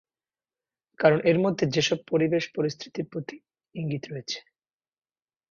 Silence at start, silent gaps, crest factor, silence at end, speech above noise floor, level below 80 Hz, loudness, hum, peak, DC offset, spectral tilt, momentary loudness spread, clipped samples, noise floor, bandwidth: 1 s; none; 22 dB; 1.1 s; over 64 dB; -68 dBFS; -26 LUFS; none; -6 dBFS; under 0.1%; -5.5 dB/octave; 14 LU; under 0.1%; under -90 dBFS; 7.4 kHz